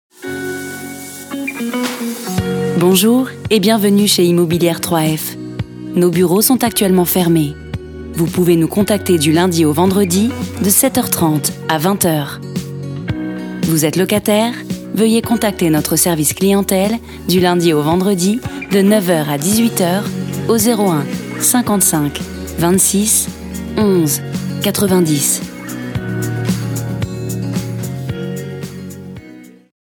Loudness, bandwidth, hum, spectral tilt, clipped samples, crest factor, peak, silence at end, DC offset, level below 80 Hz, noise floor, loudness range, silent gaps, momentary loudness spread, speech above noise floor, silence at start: -15 LUFS; over 20 kHz; none; -4.5 dB/octave; under 0.1%; 14 dB; 0 dBFS; 0.4 s; under 0.1%; -42 dBFS; -38 dBFS; 4 LU; none; 13 LU; 24 dB; 0.2 s